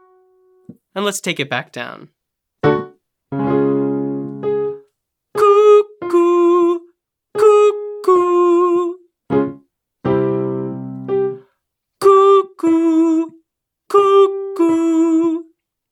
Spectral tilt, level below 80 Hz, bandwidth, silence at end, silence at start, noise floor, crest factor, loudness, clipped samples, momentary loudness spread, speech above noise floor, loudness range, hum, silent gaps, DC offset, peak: -6 dB/octave; -58 dBFS; 13.5 kHz; 0.5 s; 0.7 s; -73 dBFS; 16 dB; -15 LUFS; under 0.1%; 15 LU; 50 dB; 7 LU; none; none; under 0.1%; 0 dBFS